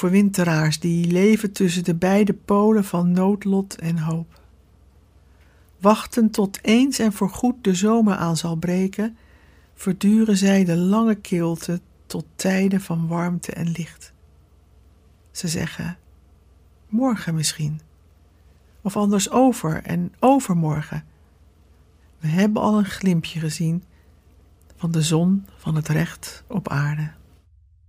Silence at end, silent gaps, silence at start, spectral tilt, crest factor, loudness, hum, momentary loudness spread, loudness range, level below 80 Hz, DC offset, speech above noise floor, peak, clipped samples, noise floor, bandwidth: 0.75 s; none; 0 s; -6 dB/octave; 20 dB; -21 LUFS; none; 12 LU; 7 LU; -52 dBFS; under 0.1%; 34 dB; -2 dBFS; under 0.1%; -54 dBFS; 16 kHz